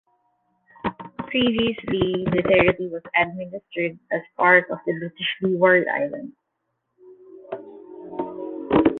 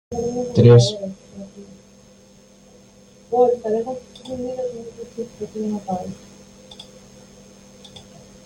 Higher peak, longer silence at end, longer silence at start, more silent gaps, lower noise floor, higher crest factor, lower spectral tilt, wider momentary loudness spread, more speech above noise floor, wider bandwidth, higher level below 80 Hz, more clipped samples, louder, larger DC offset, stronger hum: about the same, -2 dBFS vs -2 dBFS; second, 0 s vs 0.45 s; first, 0.85 s vs 0.1 s; neither; first, -77 dBFS vs -49 dBFS; about the same, 22 dB vs 20 dB; first, -9 dB/octave vs -7 dB/octave; second, 19 LU vs 28 LU; first, 55 dB vs 31 dB; second, 4.2 kHz vs 9.6 kHz; about the same, -52 dBFS vs -54 dBFS; neither; about the same, -22 LUFS vs -20 LUFS; neither; neither